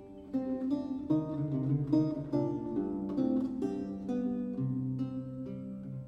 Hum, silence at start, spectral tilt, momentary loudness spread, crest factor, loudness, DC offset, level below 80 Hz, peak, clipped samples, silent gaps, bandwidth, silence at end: none; 0 s; -10.5 dB/octave; 9 LU; 16 dB; -34 LUFS; under 0.1%; -60 dBFS; -16 dBFS; under 0.1%; none; 6.6 kHz; 0 s